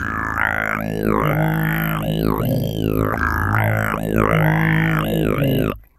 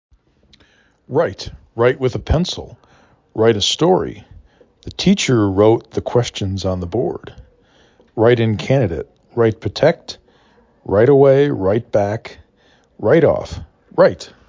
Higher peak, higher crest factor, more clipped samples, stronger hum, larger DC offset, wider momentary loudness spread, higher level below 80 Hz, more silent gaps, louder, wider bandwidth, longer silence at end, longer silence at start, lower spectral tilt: about the same, 0 dBFS vs 0 dBFS; about the same, 18 dB vs 16 dB; neither; neither; neither; second, 5 LU vs 18 LU; about the same, -34 dBFS vs -38 dBFS; neither; second, -19 LUFS vs -16 LUFS; first, 14.5 kHz vs 7.6 kHz; about the same, 0.2 s vs 0.2 s; second, 0 s vs 1.1 s; about the same, -7 dB/octave vs -6 dB/octave